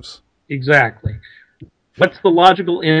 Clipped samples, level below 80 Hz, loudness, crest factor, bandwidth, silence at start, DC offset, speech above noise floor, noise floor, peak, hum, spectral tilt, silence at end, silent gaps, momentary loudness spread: 0.2%; -46 dBFS; -14 LUFS; 16 dB; 11 kHz; 0.05 s; under 0.1%; 30 dB; -44 dBFS; 0 dBFS; none; -6.5 dB/octave; 0 s; none; 17 LU